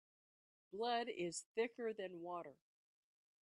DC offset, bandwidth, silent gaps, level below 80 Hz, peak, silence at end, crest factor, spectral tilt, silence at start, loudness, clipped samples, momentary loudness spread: under 0.1%; 11 kHz; 1.46-1.55 s; under -90 dBFS; -28 dBFS; 0.9 s; 18 dB; -3.5 dB/octave; 0.75 s; -44 LUFS; under 0.1%; 10 LU